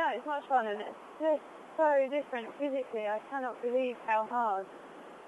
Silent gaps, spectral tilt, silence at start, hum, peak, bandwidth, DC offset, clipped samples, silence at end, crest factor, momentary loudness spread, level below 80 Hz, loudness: none; -5 dB/octave; 0 s; none; -18 dBFS; 11.5 kHz; under 0.1%; under 0.1%; 0 s; 16 dB; 11 LU; -84 dBFS; -33 LUFS